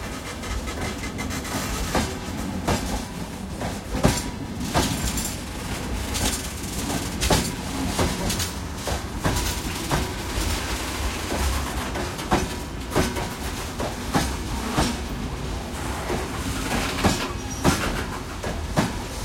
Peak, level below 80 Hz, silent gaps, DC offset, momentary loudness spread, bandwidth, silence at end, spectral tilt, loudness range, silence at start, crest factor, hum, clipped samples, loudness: -2 dBFS; -34 dBFS; none; under 0.1%; 8 LU; 16.5 kHz; 0 s; -4 dB/octave; 2 LU; 0 s; 24 dB; none; under 0.1%; -26 LUFS